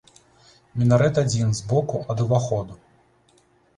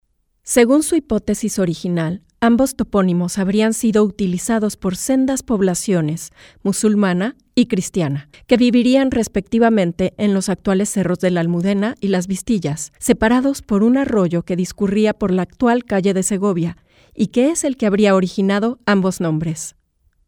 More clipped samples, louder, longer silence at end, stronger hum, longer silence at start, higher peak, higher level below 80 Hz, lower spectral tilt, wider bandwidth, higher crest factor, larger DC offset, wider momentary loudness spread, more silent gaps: neither; second, -22 LUFS vs -17 LUFS; first, 1 s vs 0.55 s; neither; first, 0.75 s vs 0.45 s; second, -4 dBFS vs 0 dBFS; second, -52 dBFS vs -44 dBFS; about the same, -6.5 dB/octave vs -5.5 dB/octave; second, 11 kHz vs 17.5 kHz; about the same, 18 dB vs 16 dB; neither; first, 10 LU vs 7 LU; neither